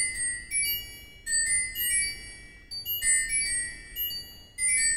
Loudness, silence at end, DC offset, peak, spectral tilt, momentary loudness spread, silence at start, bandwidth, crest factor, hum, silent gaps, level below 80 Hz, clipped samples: -26 LUFS; 0 s; 0.1%; -14 dBFS; 2 dB/octave; 17 LU; 0 s; 16 kHz; 16 dB; none; none; -50 dBFS; under 0.1%